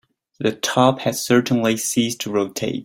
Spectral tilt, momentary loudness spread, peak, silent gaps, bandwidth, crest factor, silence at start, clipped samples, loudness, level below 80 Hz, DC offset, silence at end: -4 dB/octave; 7 LU; -2 dBFS; none; 16.5 kHz; 18 dB; 0.4 s; under 0.1%; -20 LUFS; -60 dBFS; under 0.1%; 0 s